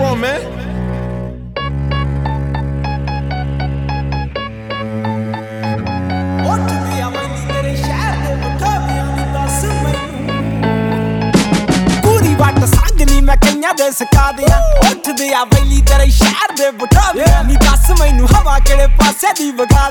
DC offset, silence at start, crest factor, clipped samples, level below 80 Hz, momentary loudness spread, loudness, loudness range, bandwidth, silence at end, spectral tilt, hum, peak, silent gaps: under 0.1%; 0 s; 12 dB; under 0.1%; -14 dBFS; 10 LU; -14 LUFS; 8 LU; 19 kHz; 0 s; -5 dB/octave; none; 0 dBFS; none